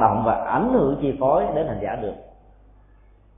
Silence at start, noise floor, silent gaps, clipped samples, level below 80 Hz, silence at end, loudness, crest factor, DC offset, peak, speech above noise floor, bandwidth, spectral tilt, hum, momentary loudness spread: 0 s; -52 dBFS; none; under 0.1%; -44 dBFS; 1.1 s; -22 LUFS; 20 dB; under 0.1%; -2 dBFS; 31 dB; 3.8 kHz; -12 dB/octave; none; 11 LU